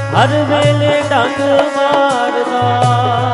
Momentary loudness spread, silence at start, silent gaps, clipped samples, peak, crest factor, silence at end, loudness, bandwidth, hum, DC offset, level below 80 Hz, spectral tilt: 2 LU; 0 s; none; under 0.1%; 0 dBFS; 12 dB; 0 s; -13 LUFS; 11.5 kHz; none; under 0.1%; -50 dBFS; -6 dB/octave